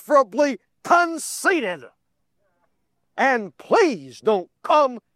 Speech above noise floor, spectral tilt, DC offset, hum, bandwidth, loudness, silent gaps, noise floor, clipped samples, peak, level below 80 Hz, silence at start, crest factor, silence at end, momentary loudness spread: 54 dB; -3.5 dB/octave; under 0.1%; none; 15.5 kHz; -21 LUFS; none; -74 dBFS; under 0.1%; -4 dBFS; -78 dBFS; 0.1 s; 18 dB; 0.15 s; 8 LU